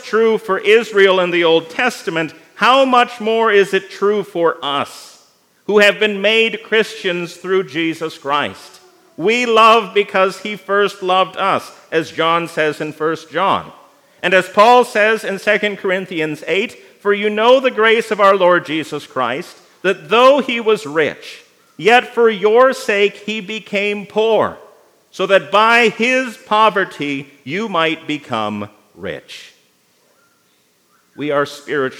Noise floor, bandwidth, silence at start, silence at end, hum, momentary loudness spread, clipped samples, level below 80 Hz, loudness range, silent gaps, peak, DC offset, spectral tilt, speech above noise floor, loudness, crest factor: -58 dBFS; 16 kHz; 0 s; 0 s; none; 12 LU; under 0.1%; -72 dBFS; 5 LU; none; 0 dBFS; under 0.1%; -4 dB/octave; 43 dB; -15 LUFS; 16 dB